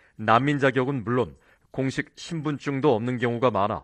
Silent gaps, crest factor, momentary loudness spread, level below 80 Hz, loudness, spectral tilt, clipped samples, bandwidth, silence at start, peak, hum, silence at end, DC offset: none; 20 dB; 11 LU; -58 dBFS; -25 LUFS; -7 dB/octave; under 0.1%; 9.6 kHz; 0.2 s; -4 dBFS; none; 0 s; under 0.1%